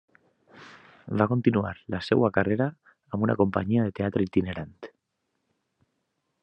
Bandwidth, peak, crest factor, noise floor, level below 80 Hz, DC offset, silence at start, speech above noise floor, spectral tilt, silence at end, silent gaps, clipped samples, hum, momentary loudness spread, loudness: 8.6 kHz; -6 dBFS; 22 dB; -79 dBFS; -66 dBFS; under 0.1%; 0.55 s; 54 dB; -9 dB/octave; 1.55 s; none; under 0.1%; none; 13 LU; -26 LUFS